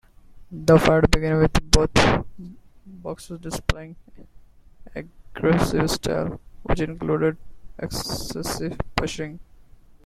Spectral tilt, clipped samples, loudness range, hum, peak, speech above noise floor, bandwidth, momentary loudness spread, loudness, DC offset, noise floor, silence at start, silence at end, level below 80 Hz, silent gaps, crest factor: -5 dB/octave; under 0.1%; 8 LU; none; 0 dBFS; 26 dB; 15.5 kHz; 21 LU; -22 LUFS; under 0.1%; -48 dBFS; 0.3 s; 0.6 s; -32 dBFS; none; 22 dB